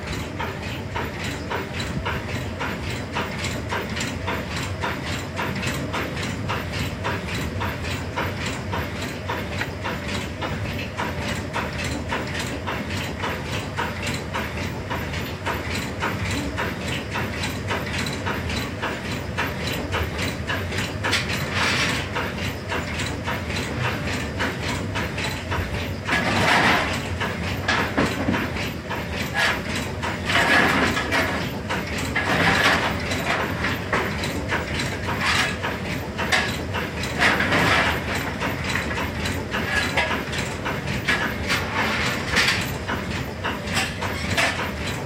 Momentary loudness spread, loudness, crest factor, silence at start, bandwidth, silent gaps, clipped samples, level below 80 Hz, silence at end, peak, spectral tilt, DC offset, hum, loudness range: 9 LU; -24 LUFS; 20 dB; 0 s; 16 kHz; none; under 0.1%; -38 dBFS; 0 s; -4 dBFS; -4 dB/octave; under 0.1%; none; 6 LU